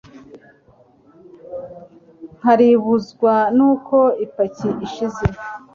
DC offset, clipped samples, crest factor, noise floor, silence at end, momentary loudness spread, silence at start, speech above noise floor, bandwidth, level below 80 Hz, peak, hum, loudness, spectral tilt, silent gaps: under 0.1%; under 0.1%; 16 dB; -52 dBFS; 0.15 s; 19 LU; 0.15 s; 36 dB; 7.2 kHz; -44 dBFS; -2 dBFS; none; -17 LUFS; -8 dB/octave; none